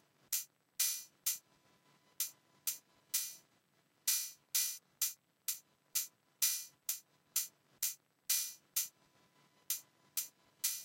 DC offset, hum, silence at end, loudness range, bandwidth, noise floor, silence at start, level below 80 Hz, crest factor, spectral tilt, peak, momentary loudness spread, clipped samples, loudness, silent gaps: under 0.1%; none; 0 s; 3 LU; 16.5 kHz; -75 dBFS; 0.3 s; under -90 dBFS; 24 dB; 4 dB/octave; -18 dBFS; 9 LU; under 0.1%; -38 LUFS; none